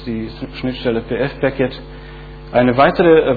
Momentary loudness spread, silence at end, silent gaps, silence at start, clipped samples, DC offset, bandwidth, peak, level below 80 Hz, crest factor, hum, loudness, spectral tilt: 23 LU; 0 s; none; 0 s; under 0.1%; under 0.1%; 4.9 kHz; 0 dBFS; -36 dBFS; 16 dB; none; -16 LUFS; -9.5 dB/octave